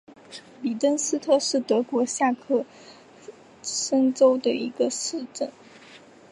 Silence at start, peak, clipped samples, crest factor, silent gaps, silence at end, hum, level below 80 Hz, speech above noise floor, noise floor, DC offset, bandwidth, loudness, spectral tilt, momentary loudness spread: 0.1 s; -6 dBFS; under 0.1%; 18 dB; none; 0.35 s; none; -76 dBFS; 25 dB; -49 dBFS; under 0.1%; 11.5 kHz; -24 LUFS; -2.5 dB/octave; 14 LU